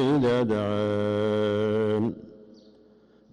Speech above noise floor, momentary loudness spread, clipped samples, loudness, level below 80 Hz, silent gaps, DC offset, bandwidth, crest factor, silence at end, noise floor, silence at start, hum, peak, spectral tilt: 33 dB; 5 LU; under 0.1%; -25 LUFS; -62 dBFS; none; under 0.1%; 10.5 kHz; 8 dB; 0.9 s; -57 dBFS; 0 s; none; -18 dBFS; -8 dB/octave